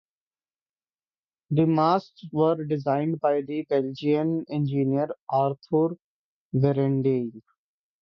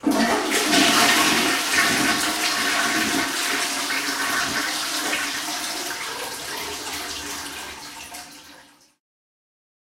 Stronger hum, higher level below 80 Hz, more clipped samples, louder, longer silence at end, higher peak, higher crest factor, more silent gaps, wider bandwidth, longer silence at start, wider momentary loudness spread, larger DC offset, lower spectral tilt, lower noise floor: neither; second, -66 dBFS vs -56 dBFS; neither; second, -25 LUFS vs -21 LUFS; second, 0.6 s vs 1.35 s; second, -8 dBFS vs -4 dBFS; about the same, 18 dB vs 20 dB; first, 5.21-5.27 s, 6.04-6.51 s vs none; second, 6.2 kHz vs 16 kHz; first, 1.5 s vs 0.05 s; second, 6 LU vs 16 LU; neither; first, -10 dB/octave vs -1 dB/octave; first, under -90 dBFS vs -50 dBFS